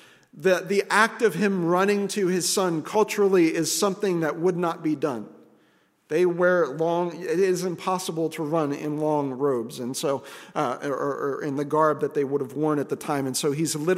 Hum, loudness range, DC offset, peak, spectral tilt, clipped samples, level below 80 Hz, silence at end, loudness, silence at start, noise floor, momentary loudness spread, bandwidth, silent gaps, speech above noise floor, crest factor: none; 5 LU; under 0.1%; -4 dBFS; -4.5 dB/octave; under 0.1%; -76 dBFS; 0 s; -24 LUFS; 0.35 s; -63 dBFS; 7 LU; 16 kHz; none; 39 dB; 22 dB